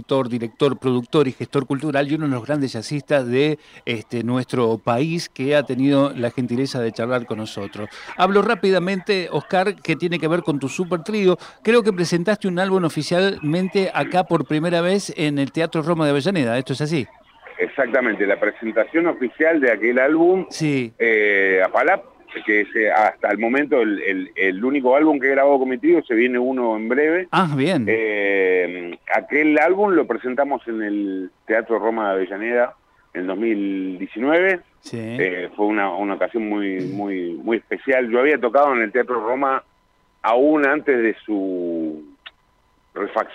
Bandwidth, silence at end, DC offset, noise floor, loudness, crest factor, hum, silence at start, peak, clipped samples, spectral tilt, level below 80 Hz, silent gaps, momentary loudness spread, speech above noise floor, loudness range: 13.5 kHz; 0 s; under 0.1%; -61 dBFS; -20 LUFS; 14 dB; none; 0 s; -6 dBFS; under 0.1%; -6 dB/octave; -64 dBFS; none; 9 LU; 41 dB; 4 LU